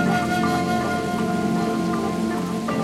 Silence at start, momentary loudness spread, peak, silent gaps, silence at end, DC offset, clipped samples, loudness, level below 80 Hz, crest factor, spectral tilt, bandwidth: 0 s; 3 LU; -10 dBFS; none; 0 s; under 0.1%; under 0.1%; -23 LUFS; -50 dBFS; 12 dB; -6 dB/octave; 15.5 kHz